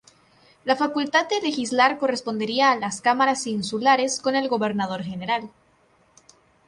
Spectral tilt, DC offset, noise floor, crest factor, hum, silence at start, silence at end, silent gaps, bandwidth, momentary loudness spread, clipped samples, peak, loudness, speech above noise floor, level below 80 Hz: -3.5 dB/octave; under 0.1%; -61 dBFS; 18 dB; none; 0.65 s; 1.2 s; none; 11.5 kHz; 7 LU; under 0.1%; -6 dBFS; -22 LUFS; 38 dB; -66 dBFS